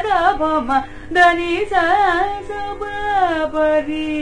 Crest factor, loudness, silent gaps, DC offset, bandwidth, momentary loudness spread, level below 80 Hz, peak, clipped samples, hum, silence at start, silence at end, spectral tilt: 16 dB; -17 LUFS; none; under 0.1%; 10.5 kHz; 11 LU; -38 dBFS; -2 dBFS; under 0.1%; none; 0 s; 0 s; -4.5 dB/octave